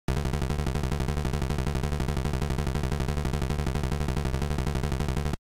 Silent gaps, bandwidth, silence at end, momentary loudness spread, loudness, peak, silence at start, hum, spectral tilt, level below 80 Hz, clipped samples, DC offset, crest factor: none; 16 kHz; 0.05 s; 0 LU; -30 LUFS; -16 dBFS; 0.1 s; none; -6.5 dB/octave; -32 dBFS; under 0.1%; under 0.1%; 12 dB